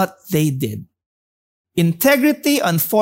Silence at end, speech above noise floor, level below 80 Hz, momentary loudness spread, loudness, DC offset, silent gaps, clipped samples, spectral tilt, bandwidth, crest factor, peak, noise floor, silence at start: 0 s; over 73 dB; -58 dBFS; 12 LU; -17 LUFS; under 0.1%; 1.06-1.65 s; under 0.1%; -5 dB/octave; 16.5 kHz; 16 dB; -2 dBFS; under -90 dBFS; 0 s